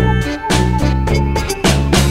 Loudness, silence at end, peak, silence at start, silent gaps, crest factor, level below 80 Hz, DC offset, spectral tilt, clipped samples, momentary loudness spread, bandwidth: -15 LUFS; 0 s; -2 dBFS; 0 s; none; 12 dB; -20 dBFS; under 0.1%; -5 dB/octave; under 0.1%; 4 LU; 16 kHz